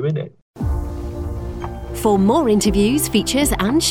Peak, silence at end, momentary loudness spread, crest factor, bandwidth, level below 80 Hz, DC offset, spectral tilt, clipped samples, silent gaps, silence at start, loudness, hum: -4 dBFS; 0 s; 13 LU; 14 dB; 19 kHz; -30 dBFS; under 0.1%; -5 dB/octave; under 0.1%; 0.42-0.54 s; 0 s; -19 LUFS; none